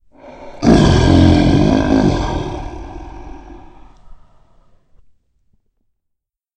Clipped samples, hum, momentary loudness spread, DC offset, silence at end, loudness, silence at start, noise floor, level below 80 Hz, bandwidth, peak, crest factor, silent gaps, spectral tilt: under 0.1%; none; 24 LU; under 0.1%; 2.4 s; -13 LUFS; 0.25 s; -75 dBFS; -26 dBFS; 9.4 kHz; 0 dBFS; 16 dB; none; -7 dB/octave